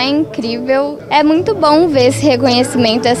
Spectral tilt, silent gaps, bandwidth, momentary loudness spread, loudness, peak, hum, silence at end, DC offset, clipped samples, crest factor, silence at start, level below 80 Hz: -5 dB/octave; none; 13.5 kHz; 6 LU; -12 LUFS; 0 dBFS; none; 0 s; under 0.1%; under 0.1%; 12 dB; 0 s; -48 dBFS